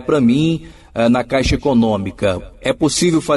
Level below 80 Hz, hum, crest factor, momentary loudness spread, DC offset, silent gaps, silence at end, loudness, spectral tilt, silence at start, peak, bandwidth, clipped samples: -34 dBFS; none; 12 dB; 8 LU; under 0.1%; none; 0 s; -16 LUFS; -5.5 dB/octave; 0 s; -4 dBFS; 11.5 kHz; under 0.1%